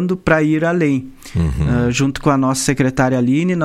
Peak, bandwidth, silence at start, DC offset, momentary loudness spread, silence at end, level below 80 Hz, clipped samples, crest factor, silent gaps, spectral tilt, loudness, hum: 0 dBFS; 13.5 kHz; 0 s; under 0.1%; 5 LU; 0 s; -32 dBFS; under 0.1%; 16 dB; none; -6 dB/octave; -16 LUFS; none